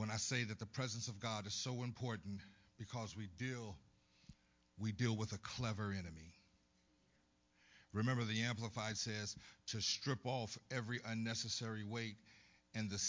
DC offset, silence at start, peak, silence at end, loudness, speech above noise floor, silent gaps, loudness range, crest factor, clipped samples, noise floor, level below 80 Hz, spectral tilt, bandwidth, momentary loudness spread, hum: under 0.1%; 0 s; -24 dBFS; 0 s; -43 LUFS; 33 dB; none; 5 LU; 20 dB; under 0.1%; -77 dBFS; -68 dBFS; -4 dB/octave; 7.6 kHz; 11 LU; none